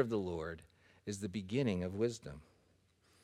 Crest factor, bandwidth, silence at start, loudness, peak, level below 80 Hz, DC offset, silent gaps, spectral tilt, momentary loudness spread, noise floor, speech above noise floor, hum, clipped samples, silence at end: 22 dB; 14 kHz; 0 s; -39 LUFS; -18 dBFS; -64 dBFS; under 0.1%; none; -6.5 dB/octave; 16 LU; -72 dBFS; 34 dB; none; under 0.1%; 0.8 s